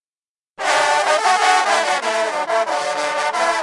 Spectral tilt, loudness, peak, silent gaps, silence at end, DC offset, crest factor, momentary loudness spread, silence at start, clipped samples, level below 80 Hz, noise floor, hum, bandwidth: 0 dB/octave; -17 LUFS; -2 dBFS; none; 0 s; under 0.1%; 16 dB; 6 LU; 0.6 s; under 0.1%; -70 dBFS; under -90 dBFS; none; 11.5 kHz